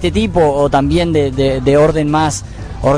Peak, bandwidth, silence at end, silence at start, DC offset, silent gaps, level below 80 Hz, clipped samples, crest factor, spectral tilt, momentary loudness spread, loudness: 0 dBFS; 11 kHz; 0 s; 0 s; 0.1%; none; -28 dBFS; under 0.1%; 12 dB; -6 dB/octave; 7 LU; -13 LUFS